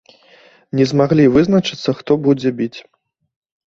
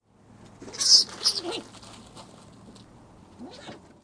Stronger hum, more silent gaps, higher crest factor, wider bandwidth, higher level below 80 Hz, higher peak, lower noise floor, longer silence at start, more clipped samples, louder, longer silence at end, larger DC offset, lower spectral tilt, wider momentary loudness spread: neither; neither; second, 16 dB vs 26 dB; second, 7.6 kHz vs 10.5 kHz; first, -50 dBFS vs -64 dBFS; about the same, -2 dBFS vs -4 dBFS; second, -48 dBFS vs -53 dBFS; first, 0.75 s vs 0.6 s; neither; first, -15 LUFS vs -20 LUFS; first, 0.9 s vs 0.25 s; neither; first, -7 dB/octave vs 0 dB/octave; second, 12 LU vs 29 LU